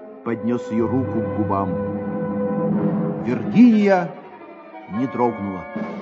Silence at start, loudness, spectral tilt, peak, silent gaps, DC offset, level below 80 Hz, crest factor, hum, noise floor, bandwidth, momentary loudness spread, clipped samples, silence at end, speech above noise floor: 0 s; -21 LUFS; -9 dB/octave; -4 dBFS; none; under 0.1%; -58 dBFS; 16 dB; none; -40 dBFS; 7.4 kHz; 17 LU; under 0.1%; 0 s; 20 dB